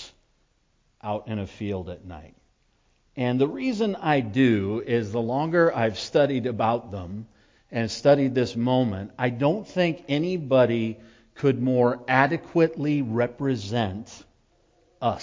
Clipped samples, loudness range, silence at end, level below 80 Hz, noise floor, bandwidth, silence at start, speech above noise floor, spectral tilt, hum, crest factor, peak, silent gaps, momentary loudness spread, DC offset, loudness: under 0.1%; 5 LU; 0 s; -54 dBFS; -67 dBFS; 7.6 kHz; 0 s; 43 dB; -7 dB/octave; none; 22 dB; -4 dBFS; none; 14 LU; under 0.1%; -24 LUFS